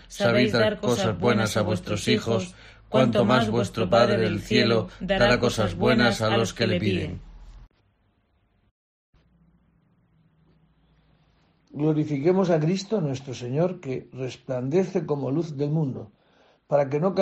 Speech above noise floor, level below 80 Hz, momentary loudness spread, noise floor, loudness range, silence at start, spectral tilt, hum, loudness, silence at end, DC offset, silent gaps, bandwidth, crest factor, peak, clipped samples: 44 dB; -50 dBFS; 10 LU; -67 dBFS; 8 LU; 0.1 s; -6 dB/octave; none; -24 LUFS; 0 s; under 0.1%; 8.71-9.13 s; 13 kHz; 20 dB; -6 dBFS; under 0.1%